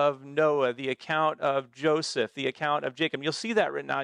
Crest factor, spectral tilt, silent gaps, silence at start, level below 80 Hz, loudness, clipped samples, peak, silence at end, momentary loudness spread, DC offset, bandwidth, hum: 16 dB; -4.5 dB/octave; none; 0 s; -74 dBFS; -28 LUFS; under 0.1%; -12 dBFS; 0 s; 4 LU; under 0.1%; 11 kHz; none